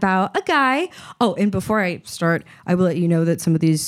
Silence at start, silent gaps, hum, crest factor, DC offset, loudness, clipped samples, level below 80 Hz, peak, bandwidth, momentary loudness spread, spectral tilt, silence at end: 0 s; none; none; 14 dB; under 0.1%; -20 LUFS; under 0.1%; -56 dBFS; -4 dBFS; 14.5 kHz; 6 LU; -6 dB/octave; 0 s